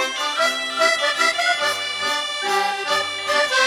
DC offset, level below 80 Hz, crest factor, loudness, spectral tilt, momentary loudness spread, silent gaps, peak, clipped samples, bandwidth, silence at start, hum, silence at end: under 0.1%; -64 dBFS; 16 dB; -19 LUFS; 0.5 dB/octave; 4 LU; none; -4 dBFS; under 0.1%; 18.5 kHz; 0 s; none; 0 s